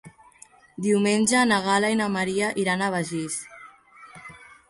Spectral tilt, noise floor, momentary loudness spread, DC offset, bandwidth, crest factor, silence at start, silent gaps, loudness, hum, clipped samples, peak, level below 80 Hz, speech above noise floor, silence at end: -4 dB/octave; -53 dBFS; 23 LU; under 0.1%; 11.5 kHz; 18 dB; 0.05 s; none; -23 LUFS; none; under 0.1%; -8 dBFS; -64 dBFS; 30 dB; 0.25 s